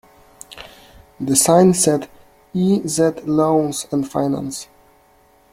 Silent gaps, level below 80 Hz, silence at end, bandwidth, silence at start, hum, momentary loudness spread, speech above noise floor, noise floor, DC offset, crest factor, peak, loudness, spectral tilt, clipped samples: none; -54 dBFS; 0.9 s; 16.5 kHz; 0.5 s; none; 24 LU; 37 dB; -54 dBFS; under 0.1%; 18 dB; 0 dBFS; -17 LUFS; -5 dB/octave; under 0.1%